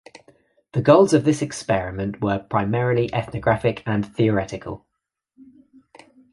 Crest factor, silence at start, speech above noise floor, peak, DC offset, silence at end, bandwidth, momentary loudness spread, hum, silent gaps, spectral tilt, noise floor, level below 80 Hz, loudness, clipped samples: 20 dB; 0.75 s; 59 dB; -2 dBFS; under 0.1%; 0.9 s; 11.5 kHz; 13 LU; none; none; -6.5 dB/octave; -79 dBFS; -48 dBFS; -21 LUFS; under 0.1%